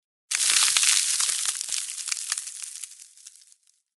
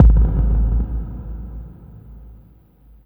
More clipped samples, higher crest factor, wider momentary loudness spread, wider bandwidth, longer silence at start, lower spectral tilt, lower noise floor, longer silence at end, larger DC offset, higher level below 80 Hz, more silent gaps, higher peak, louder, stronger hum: neither; first, 26 dB vs 18 dB; second, 17 LU vs 25 LU; first, 13.5 kHz vs 1.7 kHz; first, 0.3 s vs 0 s; second, 5.5 dB/octave vs -12 dB/octave; first, -61 dBFS vs -48 dBFS; about the same, 0.7 s vs 0.75 s; neither; second, -86 dBFS vs -18 dBFS; neither; about the same, 0 dBFS vs 0 dBFS; about the same, -22 LUFS vs -20 LUFS; neither